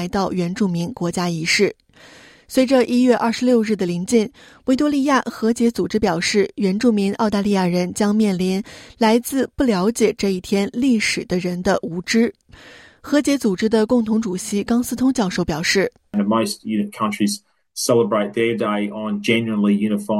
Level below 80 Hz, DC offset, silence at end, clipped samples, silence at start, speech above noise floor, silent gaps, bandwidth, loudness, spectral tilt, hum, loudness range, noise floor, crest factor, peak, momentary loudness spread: -50 dBFS; under 0.1%; 0 s; under 0.1%; 0 s; 27 dB; none; 15.5 kHz; -19 LUFS; -5 dB/octave; none; 2 LU; -46 dBFS; 16 dB; -2 dBFS; 6 LU